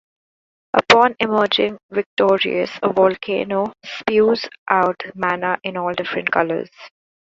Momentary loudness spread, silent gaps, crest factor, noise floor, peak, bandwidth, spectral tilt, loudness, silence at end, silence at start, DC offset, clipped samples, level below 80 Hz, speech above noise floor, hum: 9 LU; 1.83-1.89 s, 2.06-2.17 s, 4.58-4.66 s; 20 dB; under -90 dBFS; 0 dBFS; 8 kHz; -4.5 dB/octave; -18 LUFS; 0.4 s; 0.75 s; under 0.1%; under 0.1%; -58 dBFS; over 72 dB; none